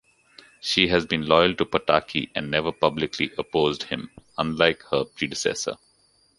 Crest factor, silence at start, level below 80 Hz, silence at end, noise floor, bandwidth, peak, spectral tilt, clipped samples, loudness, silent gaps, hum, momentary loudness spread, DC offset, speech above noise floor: 24 dB; 0.65 s; -52 dBFS; 0.65 s; -62 dBFS; 11.5 kHz; -2 dBFS; -4 dB/octave; under 0.1%; -23 LUFS; none; none; 11 LU; under 0.1%; 39 dB